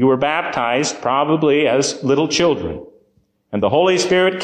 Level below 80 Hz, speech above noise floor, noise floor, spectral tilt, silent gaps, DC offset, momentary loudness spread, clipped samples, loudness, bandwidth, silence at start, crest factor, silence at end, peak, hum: -48 dBFS; 44 dB; -61 dBFS; -4 dB/octave; none; under 0.1%; 7 LU; under 0.1%; -17 LUFS; 9.8 kHz; 0 s; 12 dB; 0 s; -4 dBFS; none